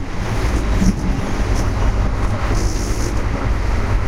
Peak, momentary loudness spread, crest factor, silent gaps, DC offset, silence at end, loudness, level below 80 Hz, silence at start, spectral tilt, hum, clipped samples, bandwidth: -2 dBFS; 4 LU; 14 dB; none; under 0.1%; 0 s; -20 LUFS; -20 dBFS; 0 s; -6 dB/octave; none; under 0.1%; 13.5 kHz